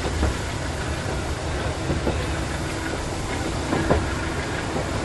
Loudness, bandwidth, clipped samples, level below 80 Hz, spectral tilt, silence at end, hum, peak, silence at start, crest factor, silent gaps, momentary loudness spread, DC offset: -26 LUFS; 12 kHz; under 0.1%; -32 dBFS; -5 dB/octave; 0 s; none; -6 dBFS; 0 s; 18 dB; none; 5 LU; under 0.1%